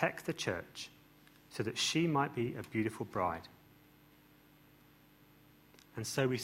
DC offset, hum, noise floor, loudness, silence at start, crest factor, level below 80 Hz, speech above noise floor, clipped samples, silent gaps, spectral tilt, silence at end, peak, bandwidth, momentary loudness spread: under 0.1%; 50 Hz at -65 dBFS; -63 dBFS; -36 LUFS; 0 s; 24 dB; -70 dBFS; 28 dB; under 0.1%; none; -4.5 dB/octave; 0 s; -14 dBFS; 16 kHz; 16 LU